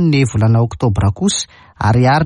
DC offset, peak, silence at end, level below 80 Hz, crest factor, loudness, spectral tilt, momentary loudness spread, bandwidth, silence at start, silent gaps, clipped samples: under 0.1%; -4 dBFS; 0 s; -34 dBFS; 10 dB; -15 LUFS; -5.5 dB/octave; 7 LU; 11 kHz; 0 s; none; under 0.1%